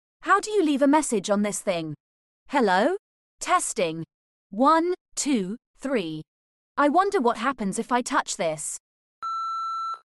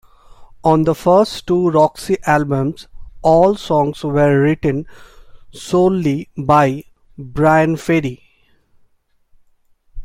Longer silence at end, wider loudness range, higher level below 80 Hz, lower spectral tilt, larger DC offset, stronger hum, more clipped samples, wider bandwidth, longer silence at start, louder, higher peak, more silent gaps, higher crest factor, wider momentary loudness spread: about the same, 0.05 s vs 0 s; about the same, 2 LU vs 3 LU; second, -62 dBFS vs -42 dBFS; second, -4 dB/octave vs -7 dB/octave; neither; neither; neither; second, 12.5 kHz vs 15.5 kHz; about the same, 0.2 s vs 0.3 s; second, -24 LUFS vs -15 LUFS; second, -8 dBFS vs 0 dBFS; first, 2.00-2.46 s, 2.99-3.38 s, 4.14-4.50 s, 5.01-5.06 s, 5.66-5.74 s, 6.27-6.75 s, 8.80-9.22 s vs none; about the same, 16 dB vs 16 dB; about the same, 14 LU vs 12 LU